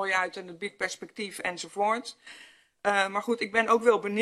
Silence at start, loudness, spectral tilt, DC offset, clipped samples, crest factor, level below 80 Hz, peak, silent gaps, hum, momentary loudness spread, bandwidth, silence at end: 0 s; -28 LUFS; -3 dB/octave; under 0.1%; under 0.1%; 22 dB; -76 dBFS; -8 dBFS; none; none; 15 LU; 13 kHz; 0 s